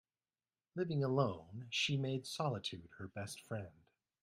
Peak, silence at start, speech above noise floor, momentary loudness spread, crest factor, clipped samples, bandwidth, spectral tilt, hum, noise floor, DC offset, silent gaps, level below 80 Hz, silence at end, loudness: -20 dBFS; 0.75 s; over 50 dB; 14 LU; 22 dB; under 0.1%; 15.5 kHz; -5 dB/octave; none; under -90 dBFS; under 0.1%; none; -76 dBFS; 0.55 s; -40 LUFS